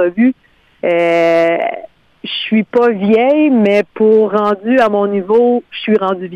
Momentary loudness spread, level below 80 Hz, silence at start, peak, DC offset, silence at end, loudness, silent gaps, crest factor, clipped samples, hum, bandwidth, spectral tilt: 10 LU; -58 dBFS; 0 s; -2 dBFS; under 0.1%; 0 s; -13 LUFS; none; 10 dB; under 0.1%; none; 8.2 kHz; -7 dB/octave